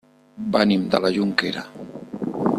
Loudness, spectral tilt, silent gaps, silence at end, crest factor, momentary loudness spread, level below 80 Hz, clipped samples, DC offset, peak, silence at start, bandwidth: -22 LUFS; -6 dB/octave; none; 0 s; 20 dB; 17 LU; -60 dBFS; under 0.1%; under 0.1%; -2 dBFS; 0.35 s; 12.5 kHz